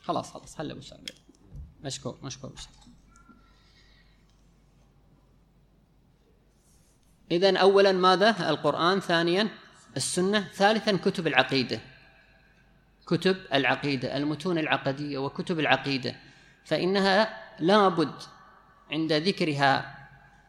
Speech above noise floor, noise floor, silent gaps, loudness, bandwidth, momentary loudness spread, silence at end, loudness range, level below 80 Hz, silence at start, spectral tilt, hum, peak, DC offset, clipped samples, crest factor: 37 dB; -62 dBFS; none; -25 LUFS; 13.5 kHz; 19 LU; 0.4 s; 18 LU; -60 dBFS; 0.05 s; -4.5 dB/octave; none; -2 dBFS; under 0.1%; under 0.1%; 26 dB